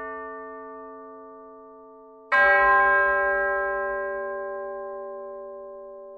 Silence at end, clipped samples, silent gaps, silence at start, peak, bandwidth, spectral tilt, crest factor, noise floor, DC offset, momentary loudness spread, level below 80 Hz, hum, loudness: 0 s; under 0.1%; none; 0 s; -8 dBFS; 6.2 kHz; -5 dB/octave; 18 dB; -48 dBFS; under 0.1%; 24 LU; -56 dBFS; none; -22 LUFS